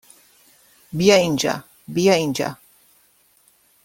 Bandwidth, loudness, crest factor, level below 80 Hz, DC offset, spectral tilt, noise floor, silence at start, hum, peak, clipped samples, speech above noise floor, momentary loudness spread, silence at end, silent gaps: 17 kHz; -19 LUFS; 20 dB; -58 dBFS; under 0.1%; -4.5 dB/octave; -58 dBFS; 0.95 s; none; -2 dBFS; under 0.1%; 40 dB; 14 LU; 1.3 s; none